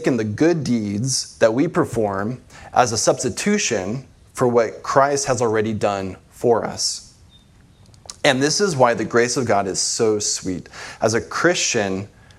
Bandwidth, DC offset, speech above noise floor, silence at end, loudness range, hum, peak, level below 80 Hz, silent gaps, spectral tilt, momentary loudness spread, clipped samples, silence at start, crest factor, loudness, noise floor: 14.5 kHz; under 0.1%; 31 dB; 0.3 s; 2 LU; none; 0 dBFS; -54 dBFS; none; -4 dB/octave; 12 LU; under 0.1%; 0 s; 20 dB; -19 LUFS; -50 dBFS